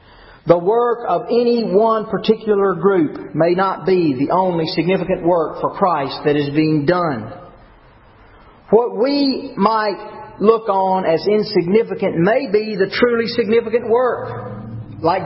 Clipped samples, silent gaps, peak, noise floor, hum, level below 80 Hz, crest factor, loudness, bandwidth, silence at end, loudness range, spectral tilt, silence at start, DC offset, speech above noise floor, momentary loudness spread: under 0.1%; none; 0 dBFS; -46 dBFS; none; -50 dBFS; 16 dB; -17 LUFS; 5.8 kHz; 0 s; 3 LU; -11 dB/octave; 0.45 s; under 0.1%; 30 dB; 6 LU